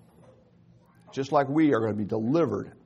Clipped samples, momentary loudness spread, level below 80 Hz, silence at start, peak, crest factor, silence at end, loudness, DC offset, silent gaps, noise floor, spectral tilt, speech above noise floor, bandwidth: under 0.1%; 9 LU; -68 dBFS; 1.1 s; -10 dBFS; 18 dB; 0.15 s; -26 LUFS; under 0.1%; none; -58 dBFS; -8 dB/octave; 33 dB; 7.6 kHz